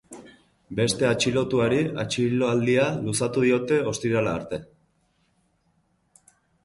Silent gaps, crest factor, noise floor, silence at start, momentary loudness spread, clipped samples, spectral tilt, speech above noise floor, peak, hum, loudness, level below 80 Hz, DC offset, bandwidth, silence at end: none; 16 dB; -68 dBFS; 0.1 s; 12 LU; under 0.1%; -5 dB/octave; 45 dB; -10 dBFS; none; -24 LUFS; -56 dBFS; under 0.1%; 11.5 kHz; 2 s